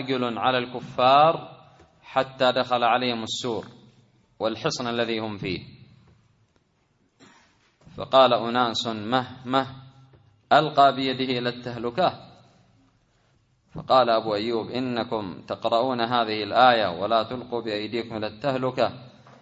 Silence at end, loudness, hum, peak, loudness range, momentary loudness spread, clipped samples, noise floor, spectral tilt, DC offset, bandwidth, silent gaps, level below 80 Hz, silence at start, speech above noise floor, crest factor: 0.35 s; -24 LUFS; none; -4 dBFS; 8 LU; 13 LU; under 0.1%; -67 dBFS; -5 dB/octave; under 0.1%; 8 kHz; none; -64 dBFS; 0 s; 43 dB; 22 dB